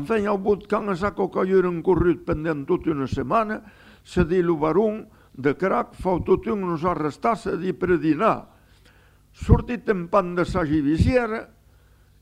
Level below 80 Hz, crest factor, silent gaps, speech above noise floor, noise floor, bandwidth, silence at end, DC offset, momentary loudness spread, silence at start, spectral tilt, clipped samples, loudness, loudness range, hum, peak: -36 dBFS; 22 dB; none; 33 dB; -55 dBFS; 11 kHz; 0.75 s; under 0.1%; 6 LU; 0 s; -8 dB/octave; under 0.1%; -23 LUFS; 1 LU; none; -2 dBFS